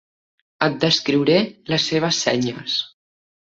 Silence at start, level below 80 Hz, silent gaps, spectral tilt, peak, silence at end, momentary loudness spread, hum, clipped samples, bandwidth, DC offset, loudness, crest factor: 0.6 s; -60 dBFS; none; -4 dB/octave; -2 dBFS; 0.6 s; 6 LU; none; under 0.1%; 8 kHz; under 0.1%; -19 LUFS; 20 dB